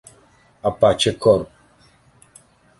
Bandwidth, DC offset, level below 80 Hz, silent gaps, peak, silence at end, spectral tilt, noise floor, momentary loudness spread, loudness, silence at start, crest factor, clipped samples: 11.5 kHz; under 0.1%; -48 dBFS; none; -2 dBFS; 1.35 s; -4.5 dB/octave; -54 dBFS; 10 LU; -18 LUFS; 0.65 s; 20 dB; under 0.1%